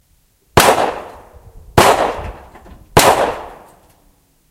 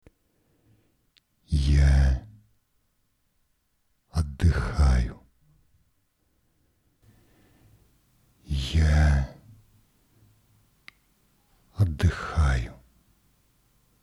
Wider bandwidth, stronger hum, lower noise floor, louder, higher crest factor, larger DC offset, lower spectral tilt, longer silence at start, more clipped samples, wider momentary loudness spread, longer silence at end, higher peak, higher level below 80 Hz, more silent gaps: first, over 20 kHz vs 11 kHz; neither; second, -56 dBFS vs -71 dBFS; first, -13 LUFS vs -25 LUFS; about the same, 16 dB vs 18 dB; neither; second, -3.5 dB/octave vs -6.5 dB/octave; second, 0.55 s vs 1.5 s; first, 0.1% vs under 0.1%; first, 20 LU vs 12 LU; second, 0.95 s vs 1.3 s; first, 0 dBFS vs -10 dBFS; second, -36 dBFS vs -30 dBFS; neither